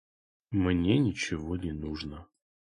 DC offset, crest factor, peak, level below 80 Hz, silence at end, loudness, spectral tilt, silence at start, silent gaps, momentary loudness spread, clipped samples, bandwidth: under 0.1%; 18 dB; -12 dBFS; -46 dBFS; 0.55 s; -30 LUFS; -6 dB/octave; 0.5 s; none; 13 LU; under 0.1%; 10.5 kHz